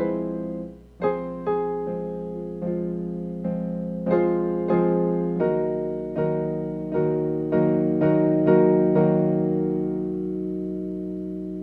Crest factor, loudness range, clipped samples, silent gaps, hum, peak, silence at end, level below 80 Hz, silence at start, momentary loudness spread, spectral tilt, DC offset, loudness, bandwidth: 18 dB; 7 LU; under 0.1%; none; 60 Hz at -50 dBFS; -6 dBFS; 0 s; -52 dBFS; 0 s; 12 LU; -11.5 dB/octave; under 0.1%; -24 LUFS; 4.5 kHz